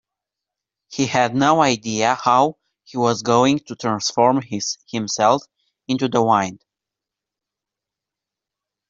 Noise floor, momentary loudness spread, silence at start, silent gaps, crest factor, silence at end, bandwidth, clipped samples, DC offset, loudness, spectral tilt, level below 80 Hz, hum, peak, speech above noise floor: -86 dBFS; 9 LU; 0.9 s; none; 18 dB; 2.35 s; 7.8 kHz; under 0.1%; under 0.1%; -19 LUFS; -4.5 dB/octave; -62 dBFS; none; -2 dBFS; 68 dB